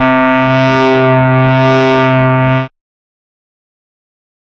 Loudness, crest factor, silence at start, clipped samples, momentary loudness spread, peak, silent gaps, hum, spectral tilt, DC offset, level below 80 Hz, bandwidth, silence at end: -9 LUFS; 10 dB; 0 s; under 0.1%; 3 LU; 0 dBFS; none; none; -8 dB/octave; under 0.1%; -42 dBFS; 6.6 kHz; 1.75 s